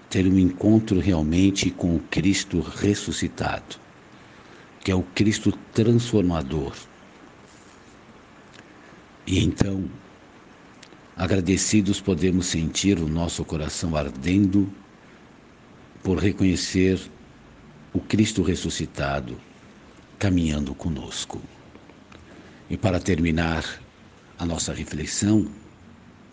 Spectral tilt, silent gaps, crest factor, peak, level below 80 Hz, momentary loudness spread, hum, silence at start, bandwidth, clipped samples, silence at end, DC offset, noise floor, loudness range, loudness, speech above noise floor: -5.5 dB/octave; none; 22 dB; -2 dBFS; -44 dBFS; 12 LU; none; 0.1 s; 10 kHz; under 0.1%; 0.65 s; under 0.1%; -50 dBFS; 6 LU; -24 LUFS; 27 dB